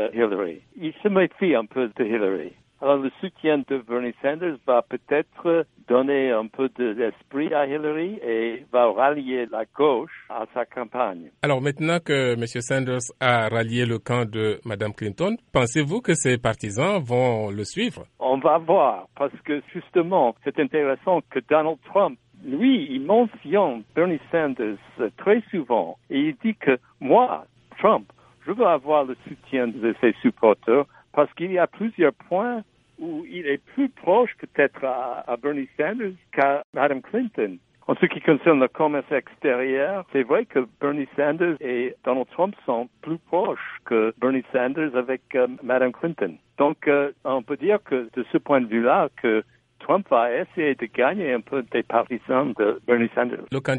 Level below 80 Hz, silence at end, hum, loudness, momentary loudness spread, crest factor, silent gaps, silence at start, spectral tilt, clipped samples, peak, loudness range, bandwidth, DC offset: -62 dBFS; 0 s; none; -23 LUFS; 9 LU; 20 dB; 36.64-36.73 s; 0 s; -6 dB/octave; under 0.1%; -2 dBFS; 2 LU; 11.5 kHz; under 0.1%